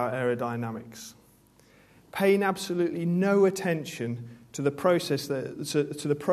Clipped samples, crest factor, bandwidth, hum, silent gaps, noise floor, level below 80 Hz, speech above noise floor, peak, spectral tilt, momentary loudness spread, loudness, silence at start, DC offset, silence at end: under 0.1%; 18 dB; 14 kHz; none; none; -59 dBFS; -68 dBFS; 32 dB; -10 dBFS; -5.5 dB/octave; 16 LU; -27 LUFS; 0 s; under 0.1%; 0 s